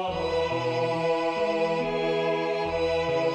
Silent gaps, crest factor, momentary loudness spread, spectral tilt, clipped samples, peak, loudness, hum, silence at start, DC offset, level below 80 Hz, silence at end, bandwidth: none; 12 dB; 2 LU; -5.5 dB/octave; under 0.1%; -14 dBFS; -26 LUFS; none; 0 s; under 0.1%; -52 dBFS; 0 s; 9 kHz